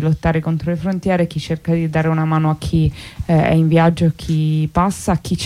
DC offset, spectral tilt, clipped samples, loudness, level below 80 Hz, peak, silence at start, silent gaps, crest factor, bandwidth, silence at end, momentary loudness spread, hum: under 0.1%; -7 dB/octave; under 0.1%; -17 LUFS; -34 dBFS; -4 dBFS; 0 s; none; 12 dB; 12 kHz; 0 s; 7 LU; none